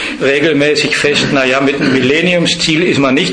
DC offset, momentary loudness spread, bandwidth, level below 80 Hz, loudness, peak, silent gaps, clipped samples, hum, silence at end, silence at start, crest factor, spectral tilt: under 0.1%; 1 LU; 10.5 kHz; -44 dBFS; -11 LUFS; 0 dBFS; none; under 0.1%; none; 0 s; 0 s; 12 dB; -4 dB/octave